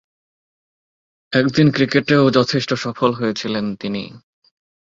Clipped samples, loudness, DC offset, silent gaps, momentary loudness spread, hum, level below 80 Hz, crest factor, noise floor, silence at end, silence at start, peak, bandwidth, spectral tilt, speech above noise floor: under 0.1%; -18 LUFS; under 0.1%; none; 11 LU; none; -56 dBFS; 18 dB; under -90 dBFS; 0.7 s; 1.3 s; -2 dBFS; 7.6 kHz; -6 dB/octave; over 73 dB